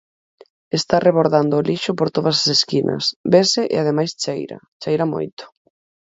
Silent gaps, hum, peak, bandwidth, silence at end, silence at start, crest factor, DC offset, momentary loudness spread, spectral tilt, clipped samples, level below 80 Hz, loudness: 3.16-3.24 s, 4.68-4.80 s, 5.33-5.37 s; none; 0 dBFS; 8 kHz; 0.65 s; 0.75 s; 18 dB; under 0.1%; 12 LU; -4.5 dB/octave; under 0.1%; -60 dBFS; -18 LUFS